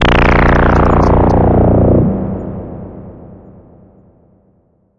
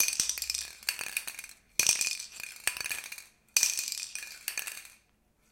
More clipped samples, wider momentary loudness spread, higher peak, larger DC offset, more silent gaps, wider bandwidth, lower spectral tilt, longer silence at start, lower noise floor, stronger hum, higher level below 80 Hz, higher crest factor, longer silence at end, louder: neither; first, 19 LU vs 15 LU; first, 0 dBFS vs -8 dBFS; neither; neither; second, 7.2 kHz vs 17 kHz; first, -8 dB/octave vs 2.5 dB/octave; about the same, 0 s vs 0 s; second, -54 dBFS vs -69 dBFS; neither; first, -20 dBFS vs -66 dBFS; second, 12 dB vs 28 dB; first, 1.65 s vs 0.55 s; first, -11 LUFS vs -31 LUFS